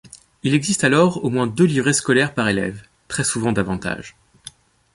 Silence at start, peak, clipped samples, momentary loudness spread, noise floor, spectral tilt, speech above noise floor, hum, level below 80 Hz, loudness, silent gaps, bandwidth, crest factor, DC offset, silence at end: 0.15 s; -2 dBFS; under 0.1%; 12 LU; -44 dBFS; -4.5 dB/octave; 25 dB; none; -50 dBFS; -19 LUFS; none; 11.5 kHz; 18 dB; under 0.1%; 0.45 s